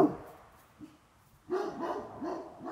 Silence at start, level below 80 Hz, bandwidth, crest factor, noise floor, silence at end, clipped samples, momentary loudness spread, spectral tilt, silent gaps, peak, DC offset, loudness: 0 s; -68 dBFS; 15.5 kHz; 26 dB; -63 dBFS; 0 s; under 0.1%; 19 LU; -7 dB/octave; none; -10 dBFS; under 0.1%; -37 LUFS